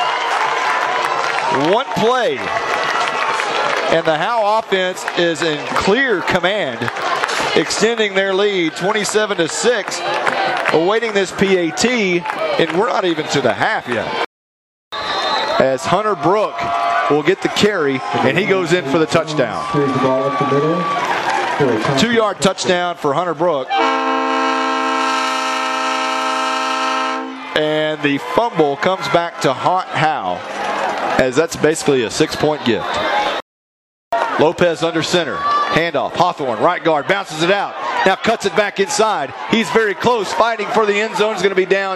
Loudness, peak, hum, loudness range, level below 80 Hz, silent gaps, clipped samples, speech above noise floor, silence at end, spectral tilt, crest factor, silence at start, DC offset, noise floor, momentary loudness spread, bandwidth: -16 LUFS; 0 dBFS; none; 2 LU; -52 dBFS; 14.26-14.91 s, 33.42-34.11 s; under 0.1%; over 74 dB; 0 s; -4 dB/octave; 16 dB; 0 s; under 0.1%; under -90 dBFS; 4 LU; 13.5 kHz